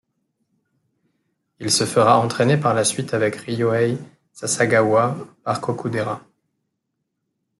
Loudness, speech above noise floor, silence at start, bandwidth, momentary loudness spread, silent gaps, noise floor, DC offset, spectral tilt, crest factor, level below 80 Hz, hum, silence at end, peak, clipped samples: -20 LUFS; 58 dB; 1.6 s; 12 kHz; 12 LU; none; -77 dBFS; under 0.1%; -4.5 dB/octave; 20 dB; -62 dBFS; none; 1.4 s; -2 dBFS; under 0.1%